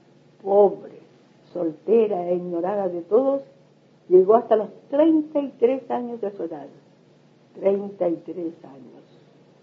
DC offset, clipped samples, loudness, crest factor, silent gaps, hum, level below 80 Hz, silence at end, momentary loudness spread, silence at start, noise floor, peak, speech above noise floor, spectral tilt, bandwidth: under 0.1%; under 0.1%; -22 LUFS; 18 dB; none; none; -80 dBFS; 0.75 s; 15 LU; 0.45 s; -55 dBFS; -4 dBFS; 34 dB; -9.5 dB/octave; 5 kHz